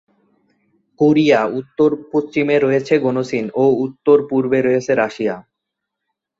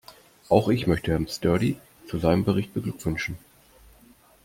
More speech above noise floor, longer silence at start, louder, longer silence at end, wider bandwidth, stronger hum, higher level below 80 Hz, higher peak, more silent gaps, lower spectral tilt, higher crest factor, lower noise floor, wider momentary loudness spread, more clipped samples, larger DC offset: first, 64 dB vs 32 dB; first, 1 s vs 0.1 s; first, -16 LUFS vs -25 LUFS; about the same, 1 s vs 1.1 s; second, 7.6 kHz vs 16.5 kHz; neither; second, -60 dBFS vs -48 dBFS; about the same, -2 dBFS vs -4 dBFS; neither; about the same, -7 dB/octave vs -6.5 dB/octave; second, 16 dB vs 22 dB; first, -79 dBFS vs -55 dBFS; second, 7 LU vs 11 LU; neither; neither